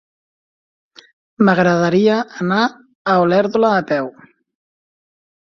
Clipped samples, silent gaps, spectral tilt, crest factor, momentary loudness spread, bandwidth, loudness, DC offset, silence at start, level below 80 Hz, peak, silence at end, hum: under 0.1%; 2.95-3.05 s; -7 dB/octave; 16 dB; 8 LU; 7 kHz; -16 LUFS; under 0.1%; 1.4 s; -60 dBFS; -2 dBFS; 1.5 s; none